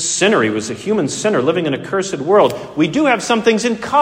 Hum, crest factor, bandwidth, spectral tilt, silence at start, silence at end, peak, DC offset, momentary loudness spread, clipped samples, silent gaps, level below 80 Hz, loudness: none; 14 dB; 16 kHz; -4 dB/octave; 0 s; 0 s; 0 dBFS; under 0.1%; 6 LU; under 0.1%; none; -54 dBFS; -16 LUFS